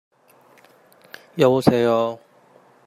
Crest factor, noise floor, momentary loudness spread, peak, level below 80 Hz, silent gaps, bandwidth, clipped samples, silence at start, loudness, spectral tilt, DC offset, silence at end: 22 dB; -54 dBFS; 18 LU; -2 dBFS; -64 dBFS; none; 15.5 kHz; under 0.1%; 1.35 s; -19 LUFS; -7 dB/octave; under 0.1%; 0.7 s